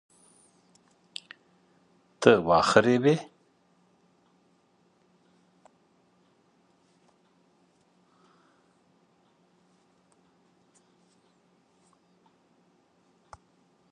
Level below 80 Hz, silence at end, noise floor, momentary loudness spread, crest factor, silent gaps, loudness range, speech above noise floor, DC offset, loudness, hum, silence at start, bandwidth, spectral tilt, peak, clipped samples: -66 dBFS; 10.7 s; -67 dBFS; 30 LU; 30 dB; none; 6 LU; 45 dB; under 0.1%; -22 LUFS; none; 2.2 s; 10.5 kHz; -5.5 dB/octave; -2 dBFS; under 0.1%